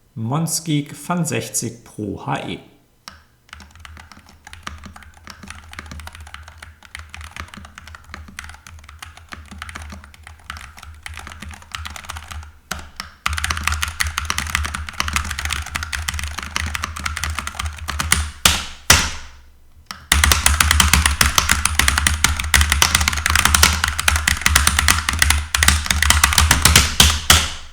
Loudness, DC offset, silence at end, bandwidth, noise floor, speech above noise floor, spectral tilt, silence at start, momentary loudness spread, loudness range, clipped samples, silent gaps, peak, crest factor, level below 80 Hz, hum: -16 LUFS; under 0.1%; 0 s; over 20 kHz; -46 dBFS; 22 dB; -2 dB/octave; 0.15 s; 23 LU; 22 LU; under 0.1%; none; 0 dBFS; 20 dB; -28 dBFS; none